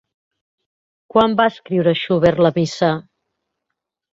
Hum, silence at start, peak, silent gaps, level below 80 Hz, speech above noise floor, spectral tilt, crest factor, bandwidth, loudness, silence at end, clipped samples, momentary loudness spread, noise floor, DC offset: none; 1.15 s; -2 dBFS; none; -52 dBFS; 63 dB; -6.5 dB/octave; 18 dB; 7.8 kHz; -17 LUFS; 1.1 s; under 0.1%; 5 LU; -80 dBFS; under 0.1%